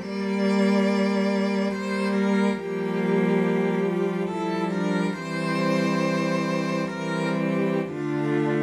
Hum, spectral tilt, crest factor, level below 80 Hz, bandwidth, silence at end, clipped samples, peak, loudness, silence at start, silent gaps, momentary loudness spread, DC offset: none; -7 dB/octave; 14 dB; -66 dBFS; 12 kHz; 0 s; under 0.1%; -10 dBFS; -24 LUFS; 0 s; none; 5 LU; under 0.1%